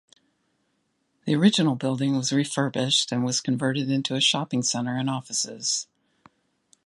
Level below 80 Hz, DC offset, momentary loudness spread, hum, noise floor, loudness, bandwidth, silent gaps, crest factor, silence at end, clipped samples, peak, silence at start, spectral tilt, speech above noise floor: -72 dBFS; under 0.1%; 7 LU; none; -72 dBFS; -24 LUFS; 11.5 kHz; none; 22 dB; 1 s; under 0.1%; -4 dBFS; 1.25 s; -4 dB/octave; 48 dB